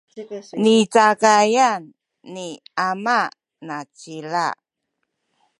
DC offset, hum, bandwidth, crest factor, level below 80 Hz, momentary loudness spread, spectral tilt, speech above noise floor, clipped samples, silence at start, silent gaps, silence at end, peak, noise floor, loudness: under 0.1%; none; 11.5 kHz; 18 dB; -76 dBFS; 20 LU; -3.5 dB/octave; 58 dB; under 0.1%; 0.15 s; none; 1.05 s; -2 dBFS; -77 dBFS; -18 LUFS